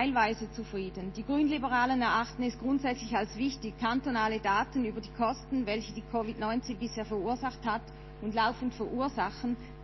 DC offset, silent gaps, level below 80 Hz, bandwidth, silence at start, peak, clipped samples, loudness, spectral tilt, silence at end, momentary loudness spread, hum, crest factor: under 0.1%; none; -50 dBFS; 6.2 kHz; 0 s; -14 dBFS; under 0.1%; -32 LUFS; -5.5 dB/octave; 0 s; 9 LU; none; 18 dB